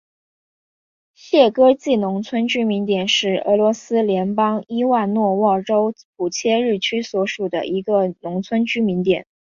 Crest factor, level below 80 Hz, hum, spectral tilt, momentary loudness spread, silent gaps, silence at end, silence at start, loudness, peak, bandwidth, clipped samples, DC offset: 18 dB; -62 dBFS; none; -5 dB/octave; 7 LU; 6.05-6.13 s; 0.25 s; 1.25 s; -19 LUFS; -2 dBFS; 7.4 kHz; under 0.1%; under 0.1%